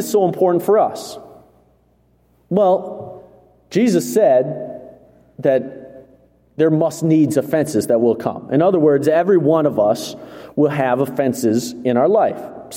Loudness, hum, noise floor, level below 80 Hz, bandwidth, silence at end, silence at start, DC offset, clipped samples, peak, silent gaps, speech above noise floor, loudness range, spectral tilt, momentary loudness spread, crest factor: -17 LUFS; 60 Hz at -50 dBFS; -57 dBFS; -60 dBFS; 16.5 kHz; 0 s; 0 s; under 0.1%; under 0.1%; -2 dBFS; none; 41 dB; 4 LU; -6.5 dB/octave; 17 LU; 16 dB